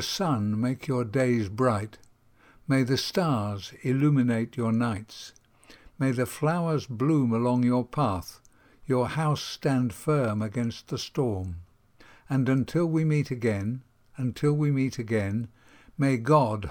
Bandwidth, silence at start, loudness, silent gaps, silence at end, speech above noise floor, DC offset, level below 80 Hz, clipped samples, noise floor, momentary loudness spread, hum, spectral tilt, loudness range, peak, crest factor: 18 kHz; 0 s; -27 LUFS; none; 0 s; 32 dB; under 0.1%; -60 dBFS; under 0.1%; -58 dBFS; 10 LU; none; -6.5 dB/octave; 2 LU; -8 dBFS; 18 dB